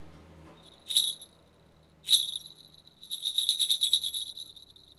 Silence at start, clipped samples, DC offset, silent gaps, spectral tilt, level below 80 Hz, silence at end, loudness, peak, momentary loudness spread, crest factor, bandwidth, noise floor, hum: 0 s; under 0.1%; under 0.1%; none; 1.5 dB/octave; -66 dBFS; 0.45 s; -27 LUFS; -8 dBFS; 18 LU; 24 dB; 16 kHz; -60 dBFS; none